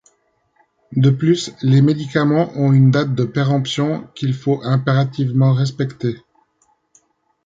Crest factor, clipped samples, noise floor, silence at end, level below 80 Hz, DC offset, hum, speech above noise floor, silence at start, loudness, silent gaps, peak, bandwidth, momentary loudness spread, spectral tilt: 16 dB; under 0.1%; -63 dBFS; 1.25 s; -56 dBFS; under 0.1%; none; 47 dB; 0.9 s; -17 LUFS; none; -2 dBFS; 7.8 kHz; 9 LU; -7.5 dB/octave